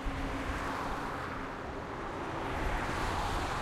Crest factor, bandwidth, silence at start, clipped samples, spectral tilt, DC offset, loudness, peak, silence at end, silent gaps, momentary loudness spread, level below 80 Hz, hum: 14 dB; 16 kHz; 0 s; under 0.1%; -5 dB/octave; under 0.1%; -36 LUFS; -22 dBFS; 0 s; none; 6 LU; -42 dBFS; none